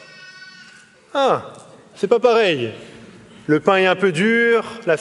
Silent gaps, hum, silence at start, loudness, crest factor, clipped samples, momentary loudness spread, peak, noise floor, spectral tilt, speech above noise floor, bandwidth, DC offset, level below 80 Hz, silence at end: none; none; 0.2 s; -17 LUFS; 18 dB; under 0.1%; 23 LU; 0 dBFS; -47 dBFS; -5.5 dB/octave; 30 dB; 11.5 kHz; under 0.1%; -66 dBFS; 0 s